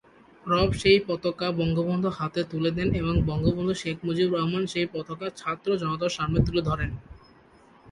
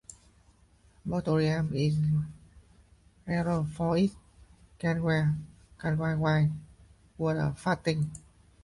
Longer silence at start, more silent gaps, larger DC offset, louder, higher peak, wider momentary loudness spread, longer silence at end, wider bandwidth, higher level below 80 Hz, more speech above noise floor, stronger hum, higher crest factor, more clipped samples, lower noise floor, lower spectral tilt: second, 0.45 s vs 1.05 s; neither; neither; first, -26 LUFS vs -29 LUFS; first, -6 dBFS vs -14 dBFS; second, 9 LU vs 13 LU; second, 0 s vs 0.45 s; about the same, 11.5 kHz vs 11.5 kHz; first, -42 dBFS vs -54 dBFS; second, 30 dB vs 34 dB; neither; about the same, 20 dB vs 16 dB; neither; second, -55 dBFS vs -62 dBFS; about the same, -6.5 dB/octave vs -7.5 dB/octave